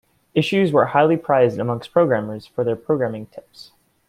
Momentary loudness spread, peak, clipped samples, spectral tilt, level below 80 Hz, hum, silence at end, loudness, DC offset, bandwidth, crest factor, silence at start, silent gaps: 11 LU; -2 dBFS; under 0.1%; -7.5 dB/octave; -60 dBFS; none; 0.45 s; -19 LUFS; under 0.1%; 13 kHz; 16 dB; 0.35 s; none